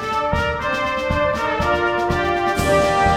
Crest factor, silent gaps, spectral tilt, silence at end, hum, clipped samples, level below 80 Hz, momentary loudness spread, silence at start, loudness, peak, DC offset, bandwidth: 14 dB; none; -5 dB/octave; 0 s; none; under 0.1%; -32 dBFS; 4 LU; 0 s; -19 LUFS; -4 dBFS; under 0.1%; 16.5 kHz